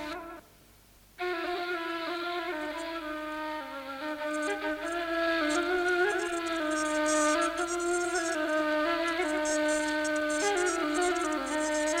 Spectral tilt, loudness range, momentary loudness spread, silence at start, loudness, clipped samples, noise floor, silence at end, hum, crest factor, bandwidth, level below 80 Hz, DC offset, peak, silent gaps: -1.5 dB/octave; 6 LU; 9 LU; 0 s; -30 LUFS; under 0.1%; -58 dBFS; 0 s; none; 14 dB; 17 kHz; -60 dBFS; under 0.1%; -16 dBFS; none